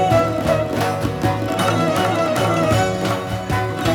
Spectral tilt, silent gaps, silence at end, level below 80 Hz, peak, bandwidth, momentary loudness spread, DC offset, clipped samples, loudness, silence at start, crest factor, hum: -5.5 dB/octave; none; 0 s; -40 dBFS; -4 dBFS; 19.5 kHz; 5 LU; under 0.1%; under 0.1%; -19 LUFS; 0 s; 14 dB; none